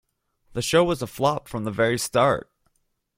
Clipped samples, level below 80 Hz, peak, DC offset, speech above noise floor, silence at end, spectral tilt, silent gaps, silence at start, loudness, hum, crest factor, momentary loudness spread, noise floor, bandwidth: under 0.1%; -52 dBFS; -4 dBFS; under 0.1%; 49 dB; 0.8 s; -4.5 dB/octave; none; 0.55 s; -23 LUFS; none; 20 dB; 9 LU; -71 dBFS; 16.5 kHz